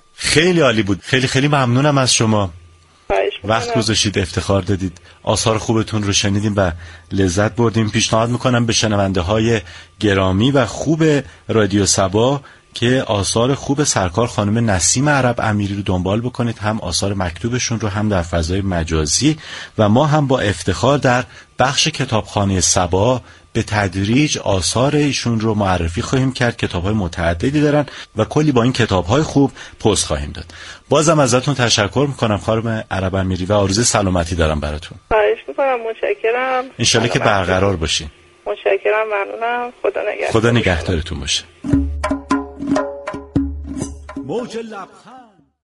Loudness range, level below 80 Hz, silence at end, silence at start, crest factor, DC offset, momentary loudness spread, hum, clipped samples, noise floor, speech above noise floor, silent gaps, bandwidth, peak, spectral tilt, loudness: 3 LU; -36 dBFS; 0.4 s; 0.2 s; 16 dB; under 0.1%; 8 LU; none; under 0.1%; -46 dBFS; 30 dB; none; 11.5 kHz; 0 dBFS; -4.5 dB/octave; -17 LUFS